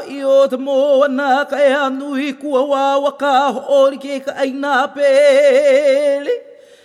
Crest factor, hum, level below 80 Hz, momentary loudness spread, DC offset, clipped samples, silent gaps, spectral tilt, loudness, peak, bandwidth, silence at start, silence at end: 12 dB; none; -76 dBFS; 10 LU; under 0.1%; under 0.1%; none; -3 dB/octave; -14 LUFS; -2 dBFS; 11 kHz; 0 s; 0.45 s